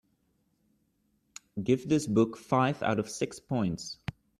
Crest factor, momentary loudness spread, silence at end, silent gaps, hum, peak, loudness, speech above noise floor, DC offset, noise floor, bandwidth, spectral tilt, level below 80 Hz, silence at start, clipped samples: 20 dB; 11 LU; 0.3 s; none; none; -12 dBFS; -30 LUFS; 45 dB; under 0.1%; -73 dBFS; 13.5 kHz; -6 dB/octave; -62 dBFS; 1.55 s; under 0.1%